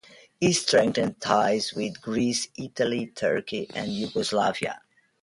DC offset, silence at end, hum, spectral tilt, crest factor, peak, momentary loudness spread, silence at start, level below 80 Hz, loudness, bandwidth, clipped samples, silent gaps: under 0.1%; 0.45 s; none; -4 dB/octave; 20 dB; -6 dBFS; 10 LU; 0.4 s; -62 dBFS; -26 LUFS; 11.5 kHz; under 0.1%; none